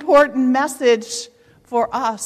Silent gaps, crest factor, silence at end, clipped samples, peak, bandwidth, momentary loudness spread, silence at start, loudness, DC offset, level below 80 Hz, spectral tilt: none; 14 dB; 0 s; under 0.1%; -4 dBFS; 14 kHz; 14 LU; 0 s; -18 LUFS; under 0.1%; -56 dBFS; -3 dB/octave